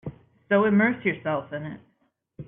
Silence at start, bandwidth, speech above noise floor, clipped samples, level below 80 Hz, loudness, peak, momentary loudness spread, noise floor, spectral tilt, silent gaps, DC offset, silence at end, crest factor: 0.05 s; 3.7 kHz; 46 dB; under 0.1%; -62 dBFS; -24 LUFS; -10 dBFS; 20 LU; -69 dBFS; -11 dB/octave; none; under 0.1%; 0.05 s; 16 dB